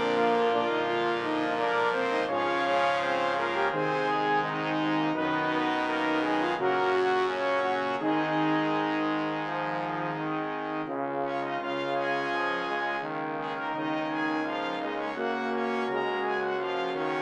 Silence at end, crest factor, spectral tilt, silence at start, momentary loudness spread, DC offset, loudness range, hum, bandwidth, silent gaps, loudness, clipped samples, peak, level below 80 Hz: 0 s; 16 dB; -5.5 dB/octave; 0 s; 6 LU; under 0.1%; 4 LU; none; 9.8 kHz; none; -28 LUFS; under 0.1%; -12 dBFS; -78 dBFS